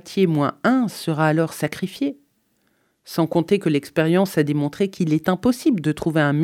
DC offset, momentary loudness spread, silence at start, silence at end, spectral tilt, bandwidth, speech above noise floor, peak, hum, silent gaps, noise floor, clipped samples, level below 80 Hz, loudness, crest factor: under 0.1%; 7 LU; 0.05 s; 0 s; -6.5 dB/octave; 16.5 kHz; 46 dB; -4 dBFS; none; none; -66 dBFS; under 0.1%; -58 dBFS; -21 LUFS; 16 dB